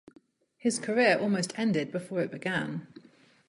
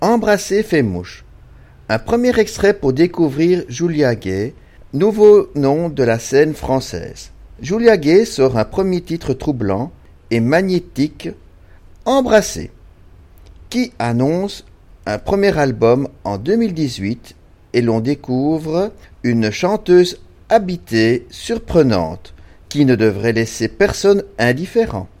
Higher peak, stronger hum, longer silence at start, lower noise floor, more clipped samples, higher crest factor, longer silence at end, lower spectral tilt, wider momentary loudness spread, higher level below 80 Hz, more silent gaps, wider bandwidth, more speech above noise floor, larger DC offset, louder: second, -10 dBFS vs 0 dBFS; neither; first, 0.65 s vs 0 s; first, -59 dBFS vs -43 dBFS; neither; about the same, 20 dB vs 16 dB; first, 0.5 s vs 0.15 s; second, -4.5 dB/octave vs -6 dB/octave; second, 9 LU vs 13 LU; second, -72 dBFS vs -40 dBFS; neither; second, 11.5 kHz vs 16 kHz; about the same, 31 dB vs 28 dB; neither; second, -29 LUFS vs -16 LUFS